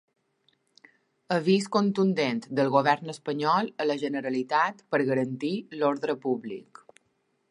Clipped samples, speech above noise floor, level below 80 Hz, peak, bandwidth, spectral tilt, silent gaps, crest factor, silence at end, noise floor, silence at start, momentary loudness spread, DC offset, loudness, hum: under 0.1%; 47 dB; -80 dBFS; -8 dBFS; 11 kHz; -6 dB/octave; none; 20 dB; 0.9 s; -73 dBFS; 1.3 s; 8 LU; under 0.1%; -27 LUFS; none